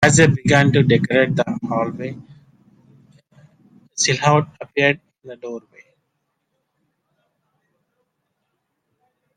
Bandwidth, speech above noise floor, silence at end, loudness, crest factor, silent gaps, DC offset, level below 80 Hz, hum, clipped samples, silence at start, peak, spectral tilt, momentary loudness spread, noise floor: 10.5 kHz; 57 dB; 3.75 s; -17 LUFS; 20 dB; none; under 0.1%; -52 dBFS; none; under 0.1%; 0 s; 0 dBFS; -4.5 dB/octave; 20 LU; -74 dBFS